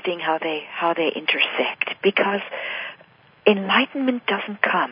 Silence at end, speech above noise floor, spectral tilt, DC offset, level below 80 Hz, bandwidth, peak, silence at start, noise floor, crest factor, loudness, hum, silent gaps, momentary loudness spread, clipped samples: 0 s; 30 dB; -9 dB/octave; under 0.1%; -74 dBFS; 5.2 kHz; 0 dBFS; 0.05 s; -52 dBFS; 22 dB; -22 LUFS; none; none; 9 LU; under 0.1%